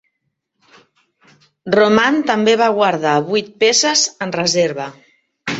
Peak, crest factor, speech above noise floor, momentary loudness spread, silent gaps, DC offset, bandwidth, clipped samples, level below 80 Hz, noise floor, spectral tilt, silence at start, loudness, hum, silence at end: -2 dBFS; 16 dB; 58 dB; 11 LU; none; under 0.1%; 8 kHz; under 0.1%; -60 dBFS; -73 dBFS; -3 dB/octave; 1.65 s; -15 LUFS; none; 0 s